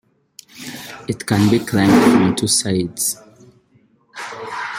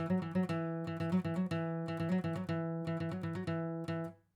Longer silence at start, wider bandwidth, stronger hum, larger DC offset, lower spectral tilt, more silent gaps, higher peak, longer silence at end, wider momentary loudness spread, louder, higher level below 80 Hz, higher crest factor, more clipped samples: first, 0.55 s vs 0 s; first, 16.5 kHz vs 10.5 kHz; neither; neither; second, -4.5 dB/octave vs -8.5 dB/octave; neither; first, -2 dBFS vs -24 dBFS; second, 0 s vs 0.2 s; first, 20 LU vs 4 LU; first, -16 LUFS vs -37 LUFS; first, -52 dBFS vs -74 dBFS; about the same, 18 dB vs 14 dB; neither